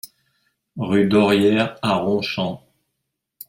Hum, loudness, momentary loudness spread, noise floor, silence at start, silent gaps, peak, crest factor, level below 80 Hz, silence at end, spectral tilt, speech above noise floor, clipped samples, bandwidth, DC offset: none; -19 LUFS; 14 LU; -78 dBFS; 0.05 s; none; -4 dBFS; 18 dB; -58 dBFS; 0.9 s; -6.5 dB/octave; 60 dB; under 0.1%; 16.5 kHz; under 0.1%